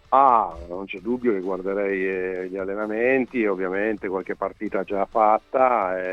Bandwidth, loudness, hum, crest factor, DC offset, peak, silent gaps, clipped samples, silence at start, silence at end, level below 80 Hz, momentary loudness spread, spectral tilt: 6.8 kHz; -23 LUFS; none; 20 dB; under 0.1%; -4 dBFS; none; under 0.1%; 0.1 s; 0 s; -52 dBFS; 10 LU; -8 dB/octave